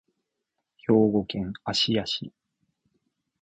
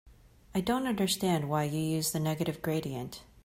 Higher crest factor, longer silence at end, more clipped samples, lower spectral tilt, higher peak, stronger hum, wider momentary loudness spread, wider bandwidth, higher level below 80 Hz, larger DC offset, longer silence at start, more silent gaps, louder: about the same, 20 dB vs 16 dB; first, 1.1 s vs 0.2 s; neither; about the same, -5.5 dB/octave vs -5 dB/octave; first, -8 dBFS vs -16 dBFS; neither; first, 12 LU vs 8 LU; second, 8.8 kHz vs 16 kHz; about the same, -58 dBFS vs -58 dBFS; neither; first, 0.9 s vs 0.05 s; neither; first, -25 LUFS vs -31 LUFS